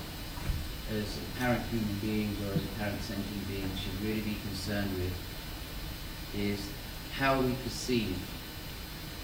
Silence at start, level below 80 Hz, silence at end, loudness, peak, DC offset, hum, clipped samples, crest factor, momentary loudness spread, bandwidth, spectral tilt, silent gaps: 0 s; -44 dBFS; 0 s; -35 LUFS; -16 dBFS; under 0.1%; none; under 0.1%; 18 dB; 10 LU; over 20 kHz; -5 dB/octave; none